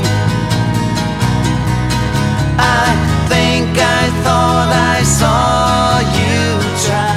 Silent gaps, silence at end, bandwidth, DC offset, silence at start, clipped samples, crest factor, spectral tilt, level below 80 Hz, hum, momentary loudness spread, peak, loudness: none; 0 s; 15.5 kHz; under 0.1%; 0 s; under 0.1%; 12 dB; -4.5 dB/octave; -26 dBFS; none; 4 LU; 0 dBFS; -13 LUFS